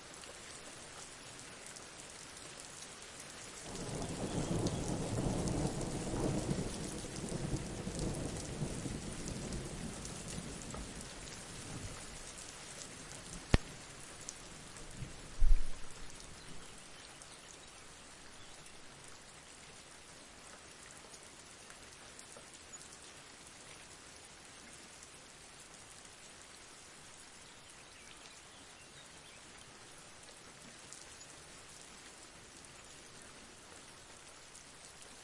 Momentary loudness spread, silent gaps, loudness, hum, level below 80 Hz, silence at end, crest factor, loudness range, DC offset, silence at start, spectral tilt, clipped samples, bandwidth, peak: 15 LU; none; -45 LUFS; none; -46 dBFS; 0 s; 34 dB; 14 LU; under 0.1%; 0 s; -4.5 dB/octave; under 0.1%; 11.5 kHz; -6 dBFS